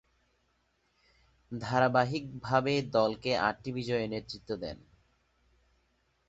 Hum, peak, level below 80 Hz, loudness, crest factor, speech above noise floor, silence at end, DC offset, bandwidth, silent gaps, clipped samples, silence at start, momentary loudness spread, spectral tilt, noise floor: none; -10 dBFS; -62 dBFS; -31 LUFS; 22 dB; 43 dB; 1.55 s; under 0.1%; 8 kHz; none; under 0.1%; 1.5 s; 13 LU; -6 dB/octave; -74 dBFS